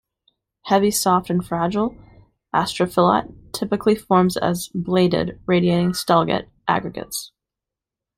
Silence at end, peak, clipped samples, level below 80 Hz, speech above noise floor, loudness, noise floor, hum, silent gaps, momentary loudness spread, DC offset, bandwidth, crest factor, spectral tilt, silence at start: 0.9 s; -2 dBFS; under 0.1%; -52 dBFS; 67 dB; -20 LUFS; -87 dBFS; none; none; 11 LU; under 0.1%; 15.5 kHz; 18 dB; -5.5 dB/octave; 0.65 s